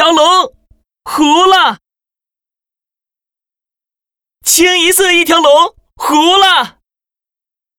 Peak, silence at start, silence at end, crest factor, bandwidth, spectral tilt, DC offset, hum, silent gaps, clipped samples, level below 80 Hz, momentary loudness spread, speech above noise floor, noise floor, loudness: 0 dBFS; 0 s; 1.1 s; 12 dB; over 20 kHz; 0 dB/octave; under 0.1%; none; none; under 0.1%; -50 dBFS; 13 LU; 80 dB; -89 dBFS; -8 LUFS